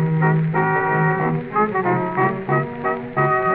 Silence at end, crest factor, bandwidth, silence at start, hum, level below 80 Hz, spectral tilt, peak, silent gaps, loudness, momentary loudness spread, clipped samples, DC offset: 0 s; 14 dB; 4.1 kHz; 0 s; none; -54 dBFS; -12 dB/octave; -4 dBFS; none; -19 LUFS; 4 LU; under 0.1%; under 0.1%